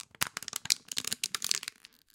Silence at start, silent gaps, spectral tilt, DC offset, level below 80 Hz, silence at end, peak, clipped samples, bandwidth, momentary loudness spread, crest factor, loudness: 0.2 s; none; 1 dB/octave; under 0.1%; -74 dBFS; 0.45 s; -2 dBFS; under 0.1%; 17 kHz; 6 LU; 34 dB; -32 LUFS